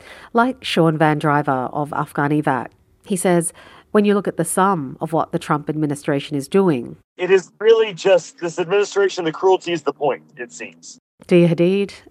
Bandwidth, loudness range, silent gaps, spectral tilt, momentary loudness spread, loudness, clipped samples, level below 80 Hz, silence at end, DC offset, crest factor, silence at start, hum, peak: 15.5 kHz; 2 LU; 7.04-7.16 s, 10.99-11.18 s; -5.5 dB/octave; 10 LU; -19 LUFS; under 0.1%; -62 dBFS; 0.1 s; under 0.1%; 18 dB; 0.1 s; none; 0 dBFS